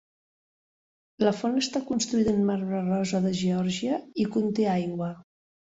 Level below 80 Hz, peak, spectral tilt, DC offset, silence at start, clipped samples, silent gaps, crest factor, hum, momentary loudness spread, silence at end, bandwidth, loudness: -62 dBFS; -10 dBFS; -5.5 dB/octave; under 0.1%; 1.2 s; under 0.1%; none; 18 dB; none; 5 LU; 0.55 s; 8 kHz; -27 LUFS